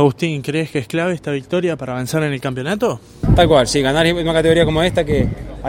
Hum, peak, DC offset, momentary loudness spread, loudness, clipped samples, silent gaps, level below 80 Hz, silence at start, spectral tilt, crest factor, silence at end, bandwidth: none; 0 dBFS; under 0.1%; 8 LU; -17 LUFS; under 0.1%; none; -30 dBFS; 0 s; -5.5 dB/octave; 16 dB; 0 s; 16.5 kHz